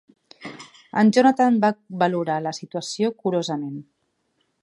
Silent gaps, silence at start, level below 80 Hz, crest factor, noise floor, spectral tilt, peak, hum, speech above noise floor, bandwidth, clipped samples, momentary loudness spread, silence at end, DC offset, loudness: none; 0.4 s; -74 dBFS; 18 dB; -71 dBFS; -5.5 dB/octave; -4 dBFS; none; 50 dB; 11.5 kHz; under 0.1%; 22 LU; 0.8 s; under 0.1%; -21 LUFS